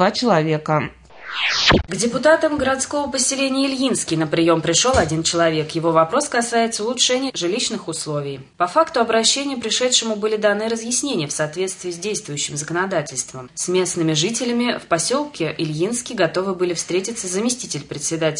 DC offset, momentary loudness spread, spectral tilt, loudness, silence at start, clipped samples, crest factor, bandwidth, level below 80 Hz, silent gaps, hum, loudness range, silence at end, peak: under 0.1%; 9 LU; -3 dB/octave; -19 LUFS; 0 s; under 0.1%; 18 dB; 11 kHz; -46 dBFS; none; none; 4 LU; 0 s; -2 dBFS